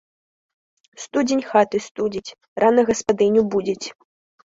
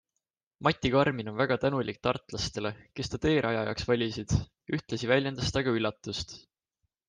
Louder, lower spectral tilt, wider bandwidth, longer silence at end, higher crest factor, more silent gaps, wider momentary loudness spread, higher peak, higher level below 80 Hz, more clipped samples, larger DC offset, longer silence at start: first, -20 LUFS vs -30 LUFS; about the same, -4.5 dB/octave vs -5.5 dB/octave; second, 8 kHz vs 10 kHz; about the same, 0.7 s vs 0.7 s; about the same, 18 dB vs 22 dB; first, 1.91-1.95 s, 2.48-2.56 s vs none; first, 15 LU vs 10 LU; first, -2 dBFS vs -8 dBFS; second, -58 dBFS vs -50 dBFS; neither; neither; first, 1 s vs 0.6 s